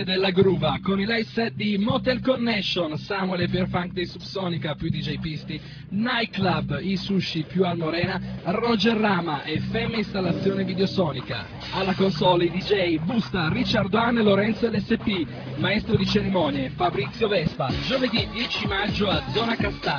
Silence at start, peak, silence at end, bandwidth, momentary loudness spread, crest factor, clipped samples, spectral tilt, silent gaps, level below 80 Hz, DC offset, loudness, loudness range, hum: 0 s; -8 dBFS; 0 s; 5.4 kHz; 7 LU; 16 dB; under 0.1%; -7 dB/octave; none; -46 dBFS; under 0.1%; -24 LUFS; 4 LU; none